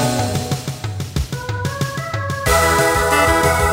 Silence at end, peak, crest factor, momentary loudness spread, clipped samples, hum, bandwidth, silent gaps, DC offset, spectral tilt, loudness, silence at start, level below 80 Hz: 0 s; 0 dBFS; 18 dB; 10 LU; under 0.1%; none; 16.5 kHz; none; under 0.1%; -4 dB/octave; -18 LUFS; 0 s; -30 dBFS